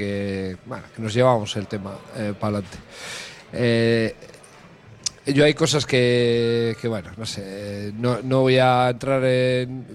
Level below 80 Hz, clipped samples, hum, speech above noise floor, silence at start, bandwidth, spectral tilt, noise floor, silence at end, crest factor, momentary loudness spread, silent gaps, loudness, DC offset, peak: -54 dBFS; under 0.1%; none; 25 dB; 0 s; 13 kHz; -5.5 dB/octave; -47 dBFS; 0 s; 18 dB; 15 LU; none; -21 LUFS; under 0.1%; -4 dBFS